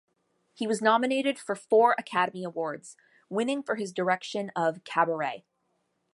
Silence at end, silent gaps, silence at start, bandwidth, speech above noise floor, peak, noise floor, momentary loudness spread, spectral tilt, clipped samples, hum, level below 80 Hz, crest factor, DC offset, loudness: 0.75 s; none; 0.6 s; 11.5 kHz; 48 dB; -8 dBFS; -75 dBFS; 11 LU; -4.5 dB/octave; under 0.1%; none; -80 dBFS; 20 dB; under 0.1%; -28 LUFS